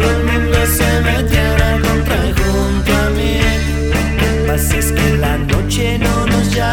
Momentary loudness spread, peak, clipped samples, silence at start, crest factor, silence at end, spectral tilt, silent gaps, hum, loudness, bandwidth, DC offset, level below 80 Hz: 3 LU; 0 dBFS; under 0.1%; 0 s; 14 dB; 0 s; -5 dB/octave; none; none; -14 LUFS; 18 kHz; under 0.1%; -18 dBFS